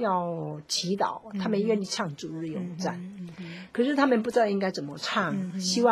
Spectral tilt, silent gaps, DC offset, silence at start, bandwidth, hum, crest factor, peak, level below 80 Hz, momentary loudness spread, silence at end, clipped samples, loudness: -4.5 dB/octave; none; under 0.1%; 0 s; 16 kHz; none; 20 dB; -8 dBFS; -70 dBFS; 12 LU; 0 s; under 0.1%; -28 LUFS